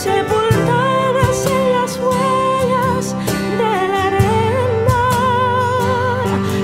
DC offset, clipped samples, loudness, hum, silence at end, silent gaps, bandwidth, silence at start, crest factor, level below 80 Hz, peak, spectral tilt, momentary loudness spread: under 0.1%; under 0.1%; -15 LUFS; none; 0 s; none; 16 kHz; 0 s; 14 dB; -38 dBFS; 0 dBFS; -5.5 dB/octave; 3 LU